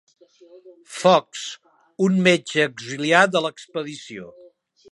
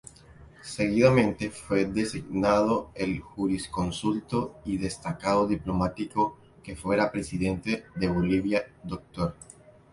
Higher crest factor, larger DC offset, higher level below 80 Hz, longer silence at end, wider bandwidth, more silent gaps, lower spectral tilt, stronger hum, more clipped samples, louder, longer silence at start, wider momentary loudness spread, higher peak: about the same, 22 dB vs 20 dB; neither; second, -72 dBFS vs -48 dBFS; about the same, 0.6 s vs 0.5 s; about the same, 11.5 kHz vs 11.5 kHz; neither; second, -4.5 dB/octave vs -6 dB/octave; neither; neither; first, -20 LUFS vs -28 LUFS; first, 0.65 s vs 0.3 s; first, 20 LU vs 11 LU; first, 0 dBFS vs -8 dBFS